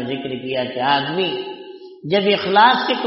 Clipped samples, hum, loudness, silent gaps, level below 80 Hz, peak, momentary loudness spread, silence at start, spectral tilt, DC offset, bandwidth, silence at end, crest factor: under 0.1%; none; -18 LUFS; none; -64 dBFS; 0 dBFS; 20 LU; 0 s; -1.5 dB/octave; under 0.1%; 5.8 kHz; 0 s; 18 dB